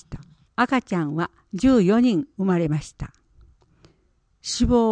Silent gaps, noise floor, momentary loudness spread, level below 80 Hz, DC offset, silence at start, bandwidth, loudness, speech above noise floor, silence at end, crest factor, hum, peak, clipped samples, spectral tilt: none; -64 dBFS; 20 LU; -40 dBFS; under 0.1%; 0.1 s; 9.6 kHz; -22 LUFS; 44 dB; 0 s; 16 dB; none; -6 dBFS; under 0.1%; -6 dB/octave